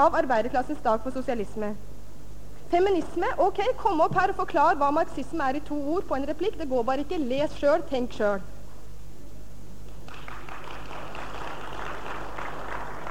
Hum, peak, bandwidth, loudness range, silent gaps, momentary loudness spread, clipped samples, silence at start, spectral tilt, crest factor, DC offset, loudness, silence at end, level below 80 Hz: 50 Hz at -45 dBFS; -8 dBFS; 16.5 kHz; 14 LU; none; 24 LU; under 0.1%; 0 s; -6 dB/octave; 18 dB; 3%; -27 LUFS; 0 s; -46 dBFS